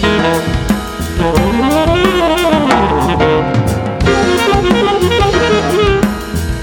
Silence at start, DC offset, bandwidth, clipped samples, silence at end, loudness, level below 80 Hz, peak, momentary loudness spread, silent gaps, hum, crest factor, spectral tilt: 0 s; under 0.1%; 20 kHz; under 0.1%; 0 s; -12 LUFS; -24 dBFS; 0 dBFS; 5 LU; none; none; 12 dB; -5.5 dB/octave